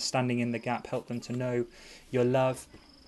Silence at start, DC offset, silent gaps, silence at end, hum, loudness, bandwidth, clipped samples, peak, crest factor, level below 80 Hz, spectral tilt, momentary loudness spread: 0 s; under 0.1%; none; 0.3 s; none; -31 LUFS; 12 kHz; under 0.1%; -14 dBFS; 16 dB; -62 dBFS; -5.5 dB/octave; 14 LU